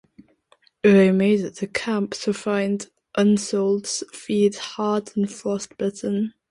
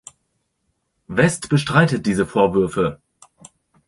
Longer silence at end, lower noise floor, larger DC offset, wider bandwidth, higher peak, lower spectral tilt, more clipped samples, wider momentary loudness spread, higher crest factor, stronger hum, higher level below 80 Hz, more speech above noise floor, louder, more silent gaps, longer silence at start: second, 0.2 s vs 0.95 s; second, -60 dBFS vs -71 dBFS; neither; about the same, 11.5 kHz vs 11.5 kHz; about the same, -4 dBFS vs -2 dBFS; about the same, -5.5 dB/octave vs -6 dB/octave; neither; first, 11 LU vs 7 LU; about the same, 18 dB vs 18 dB; neither; second, -64 dBFS vs -48 dBFS; second, 39 dB vs 54 dB; second, -22 LUFS vs -19 LUFS; neither; second, 0.85 s vs 1.1 s